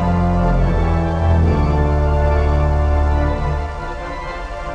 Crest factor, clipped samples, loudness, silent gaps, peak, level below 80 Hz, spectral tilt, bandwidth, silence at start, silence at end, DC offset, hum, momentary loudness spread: 12 dB; under 0.1%; -18 LUFS; none; -4 dBFS; -18 dBFS; -8.5 dB/octave; 7.2 kHz; 0 s; 0 s; 0.3%; none; 11 LU